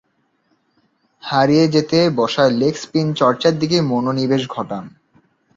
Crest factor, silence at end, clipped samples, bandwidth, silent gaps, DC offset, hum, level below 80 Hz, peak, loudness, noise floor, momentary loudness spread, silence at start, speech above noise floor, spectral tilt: 16 dB; 0.7 s; under 0.1%; 7.8 kHz; none; under 0.1%; none; -56 dBFS; -2 dBFS; -17 LUFS; -64 dBFS; 11 LU; 1.25 s; 48 dB; -6 dB/octave